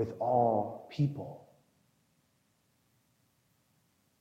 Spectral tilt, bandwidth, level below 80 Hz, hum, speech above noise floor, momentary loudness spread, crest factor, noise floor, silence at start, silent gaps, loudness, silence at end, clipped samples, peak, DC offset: -9.5 dB/octave; 7.8 kHz; -78 dBFS; none; 42 dB; 15 LU; 20 dB; -74 dBFS; 0 s; none; -31 LUFS; 2.85 s; under 0.1%; -16 dBFS; under 0.1%